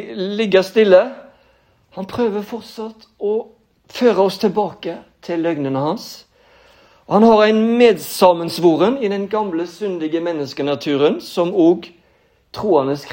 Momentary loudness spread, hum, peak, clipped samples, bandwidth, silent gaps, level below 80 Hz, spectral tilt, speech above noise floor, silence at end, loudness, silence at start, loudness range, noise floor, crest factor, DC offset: 17 LU; none; 0 dBFS; under 0.1%; 16.5 kHz; none; -60 dBFS; -6 dB/octave; 41 dB; 0 s; -17 LUFS; 0 s; 6 LU; -57 dBFS; 18 dB; under 0.1%